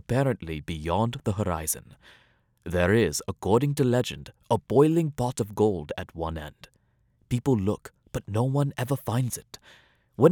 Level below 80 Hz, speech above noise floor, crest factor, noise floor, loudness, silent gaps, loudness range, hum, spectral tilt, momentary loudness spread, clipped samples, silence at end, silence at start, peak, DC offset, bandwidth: -52 dBFS; 40 dB; 22 dB; -67 dBFS; -27 LUFS; none; 5 LU; none; -6 dB/octave; 14 LU; under 0.1%; 0 s; 0.1 s; -4 dBFS; under 0.1%; 19 kHz